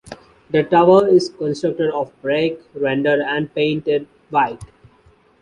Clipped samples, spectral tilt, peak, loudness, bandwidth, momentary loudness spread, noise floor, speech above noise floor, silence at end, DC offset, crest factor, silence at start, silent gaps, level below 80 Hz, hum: under 0.1%; -6.5 dB/octave; -2 dBFS; -18 LUFS; 11 kHz; 11 LU; -53 dBFS; 36 dB; 0.75 s; under 0.1%; 16 dB; 0.1 s; none; -54 dBFS; none